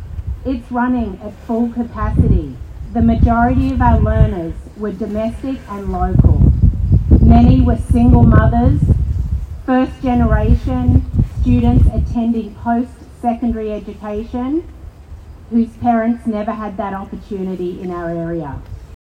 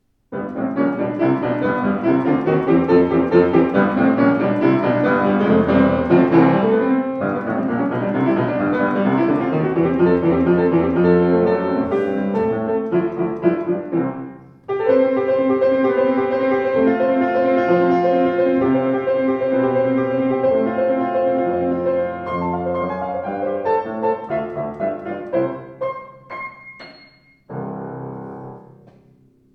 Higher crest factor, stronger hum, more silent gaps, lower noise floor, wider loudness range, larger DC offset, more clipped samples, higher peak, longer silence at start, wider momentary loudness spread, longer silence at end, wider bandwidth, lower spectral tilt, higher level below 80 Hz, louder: about the same, 14 dB vs 18 dB; neither; neither; second, -35 dBFS vs -53 dBFS; about the same, 9 LU vs 9 LU; neither; first, 0.3% vs under 0.1%; about the same, 0 dBFS vs 0 dBFS; second, 0 s vs 0.3 s; about the same, 14 LU vs 13 LU; second, 0.25 s vs 0.95 s; second, 5 kHz vs 5.6 kHz; about the same, -10 dB/octave vs -10 dB/octave; first, -20 dBFS vs -50 dBFS; about the same, -16 LUFS vs -18 LUFS